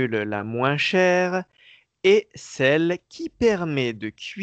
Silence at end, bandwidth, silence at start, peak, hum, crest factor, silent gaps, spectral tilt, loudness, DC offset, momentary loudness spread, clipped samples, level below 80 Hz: 0 s; 8.4 kHz; 0 s; -6 dBFS; none; 16 dB; none; -5.5 dB/octave; -22 LUFS; under 0.1%; 12 LU; under 0.1%; -56 dBFS